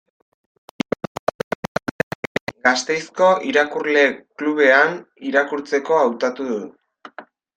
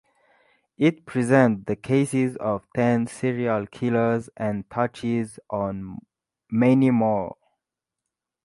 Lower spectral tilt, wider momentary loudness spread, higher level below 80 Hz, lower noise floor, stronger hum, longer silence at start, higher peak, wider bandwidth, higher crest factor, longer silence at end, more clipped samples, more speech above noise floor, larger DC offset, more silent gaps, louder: second, -4 dB/octave vs -7.5 dB/octave; first, 13 LU vs 10 LU; about the same, -62 dBFS vs -58 dBFS; second, -43 dBFS vs -86 dBFS; neither; first, 2.5 s vs 0.8 s; first, -2 dBFS vs -6 dBFS; first, 15 kHz vs 11.5 kHz; about the same, 20 dB vs 18 dB; second, 0.35 s vs 1.15 s; neither; second, 24 dB vs 63 dB; neither; neither; first, -20 LUFS vs -23 LUFS